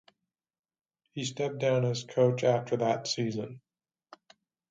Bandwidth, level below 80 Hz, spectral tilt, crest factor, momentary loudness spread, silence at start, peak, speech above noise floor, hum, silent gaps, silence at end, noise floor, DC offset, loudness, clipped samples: 9.2 kHz; -74 dBFS; -5.5 dB/octave; 20 dB; 11 LU; 1.15 s; -12 dBFS; 56 dB; none; none; 1.15 s; -85 dBFS; under 0.1%; -29 LUFS; under 0.1%